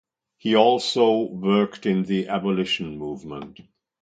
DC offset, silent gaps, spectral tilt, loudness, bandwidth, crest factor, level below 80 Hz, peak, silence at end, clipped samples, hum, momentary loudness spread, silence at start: under 0.1%; none; -6 dB/octave; -22 LUFS; 9.2 kHz; 20 dB; -60 dBFS; -2 dBFS; 0.5 s; under 0.1%; none; 16 LU; 0.45 s